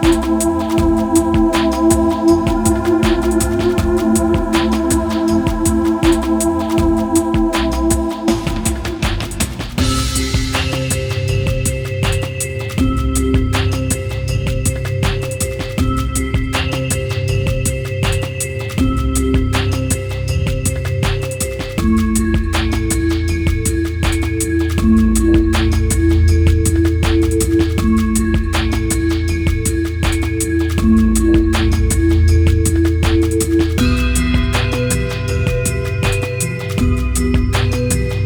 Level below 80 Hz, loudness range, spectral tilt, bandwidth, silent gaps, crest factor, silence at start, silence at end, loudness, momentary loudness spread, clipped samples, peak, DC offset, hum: -22 dBFS; 4 LU; -5.5 dB/octave; over 20 kHz; none; 14 dB; 0 s; 0 s; -16 LUFS; 6 LU; under 0.1%; 0 dBFS; under 0.1%; none